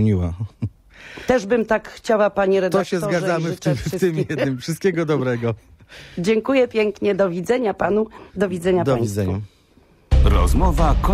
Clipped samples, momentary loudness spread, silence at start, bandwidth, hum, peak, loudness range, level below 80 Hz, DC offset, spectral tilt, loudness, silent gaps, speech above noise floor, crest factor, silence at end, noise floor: under 0.1%; 11 LU; 0 s; 15 kHz; none; -2 dBFS; 2 LU; -26 dBFS; under 0.1%; -6.5 dB/octave; -20 LUFS; none; 35 dB; 16 dB; 0 s; -54 dBFS